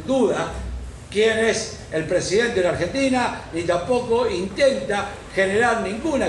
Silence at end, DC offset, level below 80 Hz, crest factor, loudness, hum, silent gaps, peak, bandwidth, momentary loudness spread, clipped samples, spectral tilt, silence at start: 0 s; under 0.1%; -40 dBFS; 16 dB; -21 LUFS; none; none; -6 dBFS; 11.5 kHz; 9 LU; under 0.1%; -4.5 dB/octave; 0 s